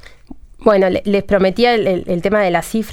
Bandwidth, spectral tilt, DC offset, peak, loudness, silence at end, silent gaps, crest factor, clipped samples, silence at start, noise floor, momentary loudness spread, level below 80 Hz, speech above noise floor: 16.5 kHz; -6 dB/octave; under 0.1%; 0 dBFS; -15 LUFS; 0 s; none; 16 dB; under 0.1%; 0.3 s; -37 dBFS; 5 LU; -38 dBFS; 22 dB